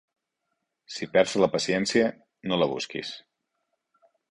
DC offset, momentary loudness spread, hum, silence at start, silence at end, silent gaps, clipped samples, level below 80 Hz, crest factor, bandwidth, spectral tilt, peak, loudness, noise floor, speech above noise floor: under 0.1%; 15 LU; none; 0.9 s; 1.1 s; none; under 0.1%; -66 dBFS; 22 dB; 11 kHz; -4 dB/octave; -6 dBFS; -26 LUFS; -81 dBFS; 55 dB